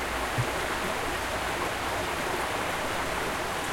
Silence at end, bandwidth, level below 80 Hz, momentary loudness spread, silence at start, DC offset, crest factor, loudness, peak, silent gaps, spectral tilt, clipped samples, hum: 0 s; 16.5 kHz; -46 dBFS; 1 LU; 0 s; under 0.1%; 14 dB; -29 LUFS; -16 dBFS; none; -3.5 dB/octave; under 0.1%; none